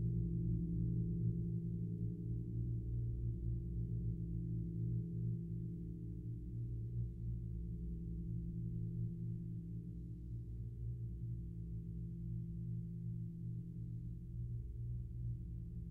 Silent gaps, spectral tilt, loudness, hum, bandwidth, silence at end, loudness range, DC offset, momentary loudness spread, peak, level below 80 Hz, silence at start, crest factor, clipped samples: none; -12.5 dB/octave; -44 LUFS; 60 Hz at -50 dBFS; 0.7 kHz; 0 s; 5 LU; under 0.1%; 8 LU; -28 dBFS; -50 dBFS; 0 s; 14 dB; under 0.1%